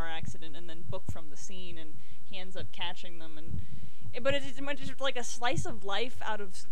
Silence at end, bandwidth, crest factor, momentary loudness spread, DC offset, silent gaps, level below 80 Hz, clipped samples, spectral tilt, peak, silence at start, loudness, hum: 0 s; 17 kHz; 20 dB; 15 LU; 9%; none; -56 dBFS; under 0.1%; -4 dB/octave; -14 dBFS; 0 s; -38 LUFS; none